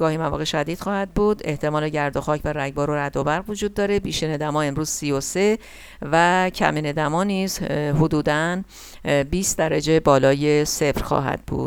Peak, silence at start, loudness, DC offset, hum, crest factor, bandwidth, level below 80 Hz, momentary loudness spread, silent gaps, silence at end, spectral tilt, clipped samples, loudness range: -2 dBFS; 0 s; -21 LUFS; under 0.1%; none; 18 dB; 18.5 kHz; -40 dBFS; 7 LU; none; 0 s; -5 dB/octave; under 0.1%; 3 LU